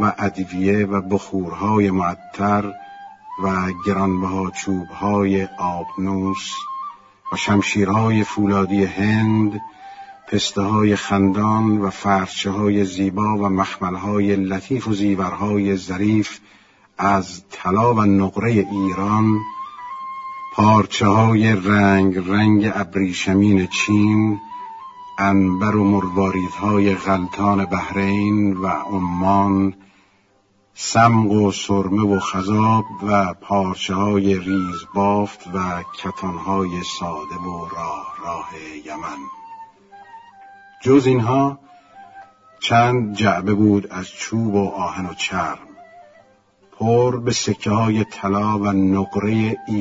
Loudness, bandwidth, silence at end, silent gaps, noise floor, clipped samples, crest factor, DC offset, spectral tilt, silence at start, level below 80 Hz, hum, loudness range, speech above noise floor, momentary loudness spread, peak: -19 LUFS; 7.8 kHz; 0 s; none; -59 dBFS; under 0.1%; 18 dB; under 0.1%; -6 dB/octave; 0 s; -52 dBFS; none; 6 LU; 41 dB; 13 LU; 0 dBFS